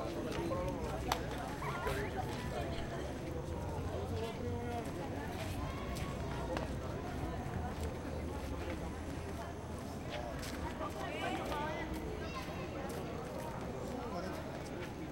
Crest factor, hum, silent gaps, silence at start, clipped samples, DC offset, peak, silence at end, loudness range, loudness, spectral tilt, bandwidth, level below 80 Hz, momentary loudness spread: 26 dB; none; none; 0 s; under 0.1%; under 0.1%; -16 dBFS; 0 s; 2 LU; -41 LUFS; -6 dB/octave; 16.5 kHz; -50 dBFS; 5 LU